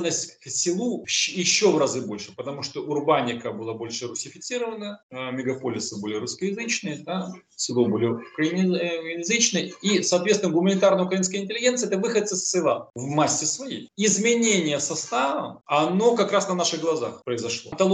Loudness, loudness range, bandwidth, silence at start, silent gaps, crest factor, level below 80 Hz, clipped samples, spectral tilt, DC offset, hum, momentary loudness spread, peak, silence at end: -24 LUFS; 7 LU; 11.5 kHz; 0 s; 5.03-5.09 s; 18 dB; -70 dBFS; under 0.1%; -3.5 dB/octave; under 0.1%; none; 11 LU; -6 dBFS; 0 s